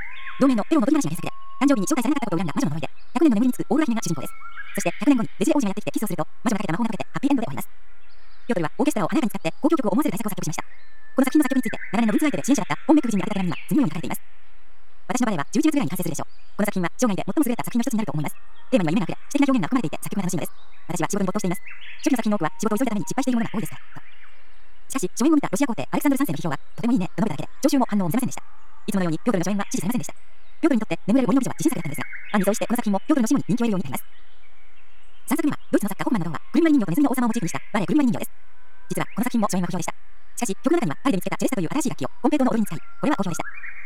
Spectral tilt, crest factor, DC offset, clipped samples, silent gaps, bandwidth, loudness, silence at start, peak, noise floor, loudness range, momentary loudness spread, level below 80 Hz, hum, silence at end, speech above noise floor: -5.5 dB/octave; 18 dB; 5%; under 0.1%; none; 17 kHz; -24 LUFS; 0 s; -6 dBFS; -56 dBFS; 3 LU; 11 LU; -60 dBFS; none; 0 s; 33 dB